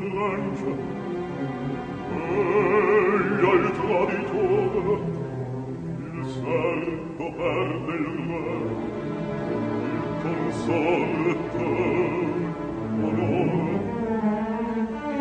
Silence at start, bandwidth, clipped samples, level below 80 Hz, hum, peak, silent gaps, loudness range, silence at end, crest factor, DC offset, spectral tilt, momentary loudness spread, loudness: 0 s; 9 kHz; under 0.1%; -52 dBFS; none; -6 dBFS; none; 6 LU; 0 s; 18 dB; under 0.1%; -8 dB/octave; 10 LU; -25 LUFS